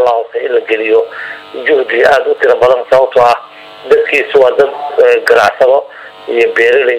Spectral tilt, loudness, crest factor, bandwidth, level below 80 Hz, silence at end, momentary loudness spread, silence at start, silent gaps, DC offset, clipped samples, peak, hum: -3.5 dB/octave; -10 LUFS; 10 dB; 12.5 kHz; -50 dBFS; 0 s; 9 LU; 0 s; none; under 0.1%; 0.7%; 0 dBFS; none